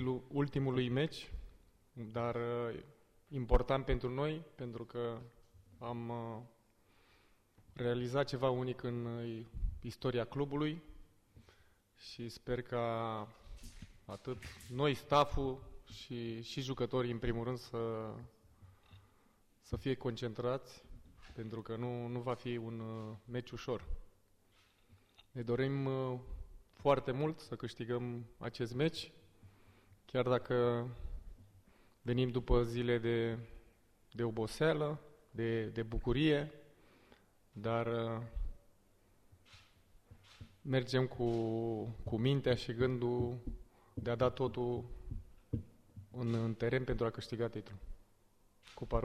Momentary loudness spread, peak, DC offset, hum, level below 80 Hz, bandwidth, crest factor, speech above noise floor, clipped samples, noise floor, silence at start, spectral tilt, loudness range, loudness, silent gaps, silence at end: 18 LU; -16 dBFS; under 0.1%; none; -50 dBFS; 14 kHz; 24 dB; 33 dB; under 0.1%; -70 dBFS; 0 s; -7 dB/octave; 7 LU; -38 LUFS; none; 0 s